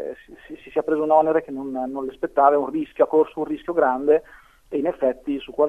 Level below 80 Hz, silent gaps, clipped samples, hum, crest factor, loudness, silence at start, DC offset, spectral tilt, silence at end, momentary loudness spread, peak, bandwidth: -56 dBFS; none; under 0.1%; none; 18 dB; -22 LUFS; 0 s; under 0.1%; -7.5 dB/octave; 0 s; 12 LU; -2 dBFS; 3.8 kHz